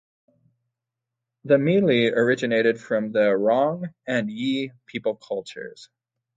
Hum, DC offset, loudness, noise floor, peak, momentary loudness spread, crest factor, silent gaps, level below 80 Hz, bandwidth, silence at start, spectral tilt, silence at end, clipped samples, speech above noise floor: none; under 0.1%; -23 LUFS; -85 dBFS; -6 dBFS; 13 LU; 18 dB; none; -70 dBFS; 9 kHz; 1.45 s; -6.5 dB/octave; 0.55 s; under 0.1%; 62 dB